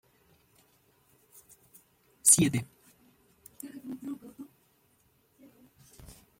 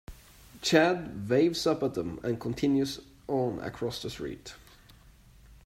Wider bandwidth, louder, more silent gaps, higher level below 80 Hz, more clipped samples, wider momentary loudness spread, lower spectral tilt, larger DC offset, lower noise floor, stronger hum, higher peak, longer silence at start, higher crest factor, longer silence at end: about the same, 16.5 kHz vs 16 kHz; first, -25 LUFS vs -29 LUFS; neither; second, -66 dBFS vs -56 dBFS; neither; first, 29 LU vs 15 LU; second, -3 dB/octave vs -5 dB/octave; neither; first, -69 dBFS vs -56 dBFS; neither; about the same, -6 dBFS vs -8 dBFS; first, 2.25 s vs 0.1 s; first, 28 dB vs 22 dB; first, 0.25 s vs 0.1 s